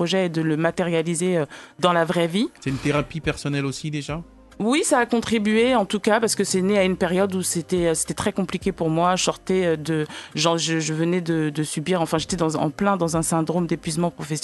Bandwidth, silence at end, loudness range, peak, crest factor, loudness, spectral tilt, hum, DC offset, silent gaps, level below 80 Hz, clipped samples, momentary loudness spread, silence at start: 12.5 kHz; 0 s; 3 LU; -4 dBFS; 18 dB; -22 LUFS; -4.5 dB/octave; none; under 0.1%; none; -48 dBFS; under 0.1%; 7 LU; 0 s